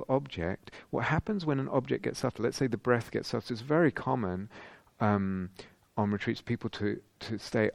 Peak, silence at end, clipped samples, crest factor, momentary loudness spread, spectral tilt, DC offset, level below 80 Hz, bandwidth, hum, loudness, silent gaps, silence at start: -10 dBFS; 0 s; under 0.1%; 22 dB; 12 LU; -6.5 dB/octave; under 0.1%; -58 dBFS; 14.5 kHz; none; -32 LUFS; none; 0 s